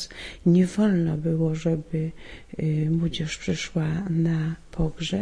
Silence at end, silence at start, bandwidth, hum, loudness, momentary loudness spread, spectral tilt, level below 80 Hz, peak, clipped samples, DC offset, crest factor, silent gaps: 0 s; 0 s; 10 kHz; none; -25 LUFS; 9 LU; -7 dB/octave; -44 dBFS; -10 dBFS; under 0.1%; under 0.1%; 14 dB; none